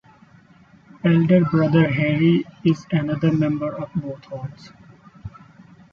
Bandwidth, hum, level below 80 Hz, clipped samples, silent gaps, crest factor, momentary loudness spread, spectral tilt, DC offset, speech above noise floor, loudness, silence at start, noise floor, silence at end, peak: 6.8 kHz; none; -54 dBFS; under 0.1%; none; 16 dB; 19 LU; -9 dB/octave; under 0.1%; 32 dB; -20 LUFS; 1.05 s; -51 dBFS; 0.65 s; -4 dBFS